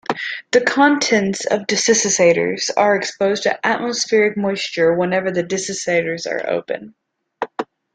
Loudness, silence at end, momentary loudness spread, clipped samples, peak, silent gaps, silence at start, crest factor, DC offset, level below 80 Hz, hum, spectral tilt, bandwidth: -17 LUFS; 0.3 s; 10 LU; under 0.1%; -2 dBFS; none; 0.1 s; 16 dB; under 0.1%; -62 dBFS; none; -3 dB/octave; 9.8 kHz